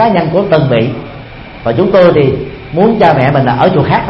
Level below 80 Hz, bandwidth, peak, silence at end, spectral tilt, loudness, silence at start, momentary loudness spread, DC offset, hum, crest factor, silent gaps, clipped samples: -36 dBFS; 5.8 kHz; 0 dBFS; 0 s; -9.5 dB/octave; -10 LUFS; 0 s; 14 LU; under 0.1%; none; 10 dB; none; 0.2%